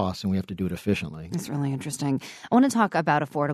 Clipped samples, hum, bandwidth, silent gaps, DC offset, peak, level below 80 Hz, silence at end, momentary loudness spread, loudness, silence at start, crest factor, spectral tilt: under 0.1%; none; 13.5 kHz; none; under 0.1%; -8 dBFS; -58 dBFS; 0 s; 10 LU; -26 LUFS; 0 s; 18 dB; -6 dB/octave